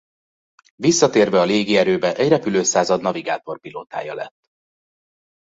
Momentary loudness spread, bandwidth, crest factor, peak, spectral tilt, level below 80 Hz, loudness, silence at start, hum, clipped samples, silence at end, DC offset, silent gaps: 15 LU; 8 kHz; 18 dB; -2 dBFS; -4 dB/octave; -60 dBFS; -18 LUFS; 0.8 s; none; under 0.1%; 1.15 s; under 0.1%; none